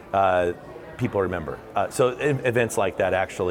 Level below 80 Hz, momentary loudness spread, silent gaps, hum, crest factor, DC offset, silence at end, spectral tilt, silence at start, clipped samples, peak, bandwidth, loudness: -52 dBFS; 9 LU; none; none; 14 dB; under 0.1%; 0 s; -5.5 dB/octave; 0 s; under 0.1%; -8 dBFS; 17.5 kHz; -24 LUFS